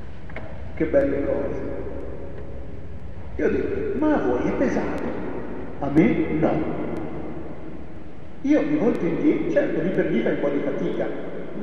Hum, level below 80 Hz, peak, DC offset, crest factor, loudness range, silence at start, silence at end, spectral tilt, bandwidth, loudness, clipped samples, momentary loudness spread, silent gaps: none; -42 dBFS; -4 dBFS; 3%; 18 dB; 4 LU; 0 s; 0 s; -8.5 dB/octave; 6.6 kHz; -24 LUFS; under 0.1%; 17 LU; none